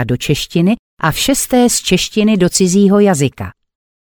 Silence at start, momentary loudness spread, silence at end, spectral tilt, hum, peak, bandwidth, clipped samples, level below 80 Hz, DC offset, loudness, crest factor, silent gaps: 0 s; 7 LU; 0.5 s; -4.5 dB/octave; none; 0 dBFS; over 20 kHz; under 0.1%; -38 dBFS; under 0.1%; -13 LUFS; 14 dB; 0.79-0.97 s